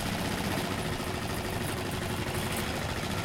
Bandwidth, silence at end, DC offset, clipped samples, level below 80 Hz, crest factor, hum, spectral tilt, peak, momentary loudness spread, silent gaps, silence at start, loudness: 17 kHz; 0 s; under 0.1%; under 0.1%; -44 dBFS; 14 dB; none; -4.5 dB/octave; -18 dBFS; 2 LU; none; 0 s; -32 LUFS